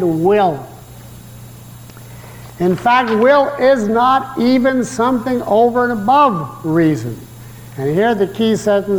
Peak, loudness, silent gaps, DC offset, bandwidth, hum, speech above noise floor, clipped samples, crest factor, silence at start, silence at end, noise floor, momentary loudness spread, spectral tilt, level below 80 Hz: -2 dBFS; -14 LUFS; none; under 0.1%; 19 kHz; none; 22 dB; under 0.1%; 12 dB; 0 s; 0 s; -36 dBFS; 22 LU; -6 dB/octave; -48 dBFS